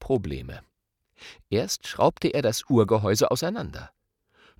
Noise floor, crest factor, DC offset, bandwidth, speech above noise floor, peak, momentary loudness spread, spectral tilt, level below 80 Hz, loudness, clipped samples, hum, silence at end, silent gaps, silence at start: -74 dBFS; 20 dB; under 0.1%; 17 kHz; 50 dB; -6 dBFS; 19 LU; -5 dB/octave; -50 dBFS; -25 LUFS; under 0.1%; none; 0.7 s; none; 0 s